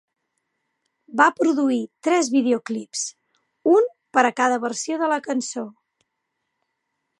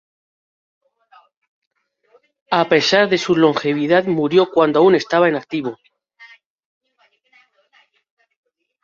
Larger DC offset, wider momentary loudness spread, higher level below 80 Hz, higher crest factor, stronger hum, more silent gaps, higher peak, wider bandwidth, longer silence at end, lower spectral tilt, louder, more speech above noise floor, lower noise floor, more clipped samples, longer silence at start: neither; about the same, 11 LU vs 9 LU; second, -82 dBFS vs -64 dBFS; about the same, 20 dB vs 18 dB; neither; neither; about the same, -2 dBFS vs 0 dBFS; first, 11.5 kHz vs 7.4 kHz; second, 1.5 s vs 2.6 s; second, -3 dB/octave vs -5 dB/octave; second, -21 LUFS vs -16 LUFS; first, 57 dB vs 46 dB; first, -78 dBFS vs -62 dBFS; neither; second, 1.1 s vs 2.5 s